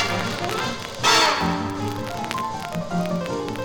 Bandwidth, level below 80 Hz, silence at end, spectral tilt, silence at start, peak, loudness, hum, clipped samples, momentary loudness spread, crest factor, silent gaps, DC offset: 19 kHz; -48 dBFS; 0 s; -3.5 dB/octave; 0 s; -4 dBFS; -23 LUFS; none; under 0.1%; 11 LU; 20 dB; none; under 0.1%